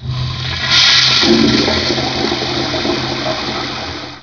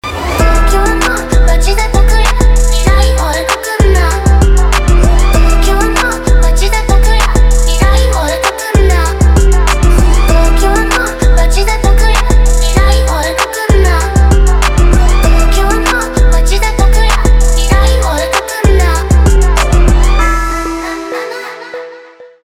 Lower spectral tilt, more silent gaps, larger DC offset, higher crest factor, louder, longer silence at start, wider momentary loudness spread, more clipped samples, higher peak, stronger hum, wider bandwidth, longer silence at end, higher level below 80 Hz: second, -3.5 dB/octave vs -5 dB/octave; neither; neither; first, 14 dB vs 8 dB; about the same, -12 LUFS vs -10 LUFS; about the same, 0 s vs 0.05 s; first, 13 LU vs 4 LU; neither; about the same, 0 dBFS vs 0 dBFS; neither; second, 5.4 kHz vs 15.5 kHz; second, 0 s vs 0.2 s; second, -36 dBFS vs -8 dBFS